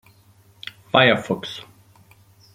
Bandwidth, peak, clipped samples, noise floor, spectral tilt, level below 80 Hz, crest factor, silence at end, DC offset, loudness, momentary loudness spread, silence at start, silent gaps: 16 kHz; -2 dBFS; under 0.1%; -54 dBFS; -5.5 dB/octave; -62 dBFS; 24 dB; 0.95 s; under 0.1%; -19 LUFS; 22 LU; 0.95 s; none